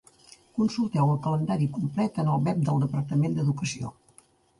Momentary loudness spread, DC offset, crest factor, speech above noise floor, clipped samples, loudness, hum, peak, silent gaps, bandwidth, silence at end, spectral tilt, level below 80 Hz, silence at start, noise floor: 7 LU; under 0.1%; 16 dB; 34 dB; under 0.1%; -27 LUFS; none; -12 dBFS; none; 11.5 kHz; 0.7 s; -7.5 dB/octave; -60 dBFS; 0.55 s; -60 dBFS